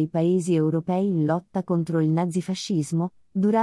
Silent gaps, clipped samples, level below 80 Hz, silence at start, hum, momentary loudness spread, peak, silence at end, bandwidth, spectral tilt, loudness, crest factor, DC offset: none; under 0.1%; -68 dBFS; 0 s; none; 5 LU; -10 dBFS; 0 s; 12 kHz; -7.5 dB/octave; -24 LUFS; 12 dB; under 0.1%